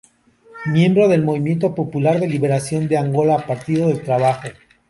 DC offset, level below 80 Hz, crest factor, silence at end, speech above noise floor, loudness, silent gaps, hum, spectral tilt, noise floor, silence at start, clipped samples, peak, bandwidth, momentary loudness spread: under 0.1%; -56 dBFS; 14 dB; 0.35 s; 34 dB; -18 LUFS; none; none; -7.5 dB/octave; -51 dBFS; 0.55 s; under 0.1%; -4 dBFS; 11.5 kHz; 6 LU